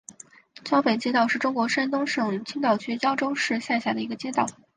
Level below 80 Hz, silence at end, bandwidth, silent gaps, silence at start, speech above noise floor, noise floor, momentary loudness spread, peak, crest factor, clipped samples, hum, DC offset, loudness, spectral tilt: -72 dBFS; 0.25 s; 9.8 kHz; none; 0.1 s; 24 dB; -49 dBFS; 6 LU; -8 dBFS; 18 dB; under 0.1%; none; under 0.1%; -25 LUFS; -4 dB/octave